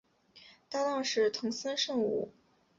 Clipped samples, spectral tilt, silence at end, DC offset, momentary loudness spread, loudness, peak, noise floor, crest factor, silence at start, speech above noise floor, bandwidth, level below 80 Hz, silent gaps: under 0.1%; -3 dB/octave; 0.5 s; under 0.1%; 8 LU; -32 LUFS; -18 dBFS; -59 dBFS; 16 dB; 0.35 s; 27 dB; 7.8 kHz; -76 dBFS; none